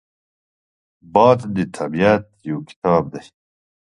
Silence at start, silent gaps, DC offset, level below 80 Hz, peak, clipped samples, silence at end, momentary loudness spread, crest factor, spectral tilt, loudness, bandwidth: 1.15 s; 2.76-2.82 s; under 0.1%; -52 dBFS; 0 dBFS; under 0.1%; 0.6 s; 14 LU; 20 dB; -7.5 dB/octave; -18 LUFS; 11 kHz